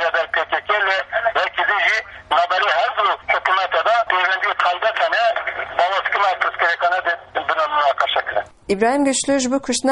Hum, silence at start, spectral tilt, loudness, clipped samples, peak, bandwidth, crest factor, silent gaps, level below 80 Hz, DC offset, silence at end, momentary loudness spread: none; 0 s; -1.5 dB/octave; -18 LUFS; under 0.1%; -2 dBFS; 11.5 kHz; 18 dB; none; -56 dBFS; under 0.1%; 0 s; 4 LU